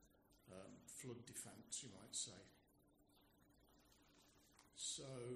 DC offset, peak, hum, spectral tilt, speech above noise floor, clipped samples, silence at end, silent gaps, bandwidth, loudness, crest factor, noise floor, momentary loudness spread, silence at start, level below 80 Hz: under 0.1%; -34 dBFS; none; -2.5 dB/octave; 22 dB; under 0.1%; 0 s; none; 15 kHz; -52 LUFS; 22 dB; -76 dBFS; 14 LU; 0 s; -82 dBFS